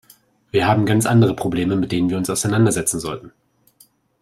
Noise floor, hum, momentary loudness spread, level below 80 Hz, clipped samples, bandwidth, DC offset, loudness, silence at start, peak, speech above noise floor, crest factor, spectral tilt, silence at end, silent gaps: -55 dBFS; none; 8 LU; -50 dBFS; under 0.1%; 15.5 kHz; under 0.1%; -18 LUFS; 0.55 s; -4 dBFS; 38 dB; 16 dB; -5.5 dB/octave; 0.95 s; none